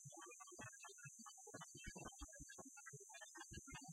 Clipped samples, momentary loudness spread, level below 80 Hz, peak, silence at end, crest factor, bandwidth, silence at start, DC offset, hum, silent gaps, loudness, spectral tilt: under 0.1%; 2 LU; -70 dBFS; -40 dBFS; 0 s; 18 dB; 16 kHz; 0 s; under 0.1%; none; none; -57 LUFS; -2.5 dB/octave